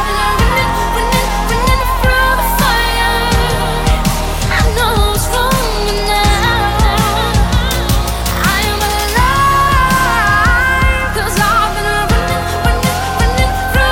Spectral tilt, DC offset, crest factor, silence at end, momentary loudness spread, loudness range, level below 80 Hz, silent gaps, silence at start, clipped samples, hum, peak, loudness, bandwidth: -4 dB/octave; under 0.1%; 12 dB; 0 s; 4 LU; 2 LU; -18 dBFS; none; 0 s; under 0.1%; none; -2 dBFS; -13 LUFS; 17 kHz